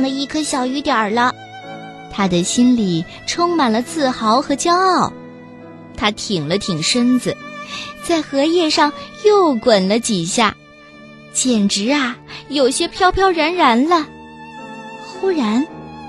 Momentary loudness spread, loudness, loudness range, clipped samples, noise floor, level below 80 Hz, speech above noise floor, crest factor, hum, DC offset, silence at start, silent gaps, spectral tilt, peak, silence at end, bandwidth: 18 LU; -16 LUFS; 2 LU; under 0.1%; -41 dBFS; -44 dBFS; 25 dB; 18 dB; none; under 0.1%; 0 s; none; -4 dB/octave; 0 dBFS; 0 s; 12.5 kHz